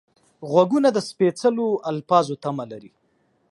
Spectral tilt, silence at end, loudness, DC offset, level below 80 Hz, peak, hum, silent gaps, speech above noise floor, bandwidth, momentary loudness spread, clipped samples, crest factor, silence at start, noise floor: -6 dB/octave; 0.65 s; -21 LUFS; under 0.1%; -72 dBFS; -2 dBFS; none; none; 45 dB; 11.5 kHz; 15 LU; under 0.1%; 20 dB; 0.4 s; -66 dBFS